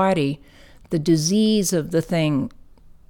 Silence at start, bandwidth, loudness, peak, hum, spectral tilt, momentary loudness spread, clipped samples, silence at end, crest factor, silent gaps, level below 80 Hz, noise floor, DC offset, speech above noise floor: 0 s; 18.5 kHz; -21 LUFS; -8 dBFS; none; -5.5 dB/octave; 9 LU; under 0.1%; 0.6 s; 14 dB; none; -48 dBFS; -46 dBFS; under 0.1%; 26 dB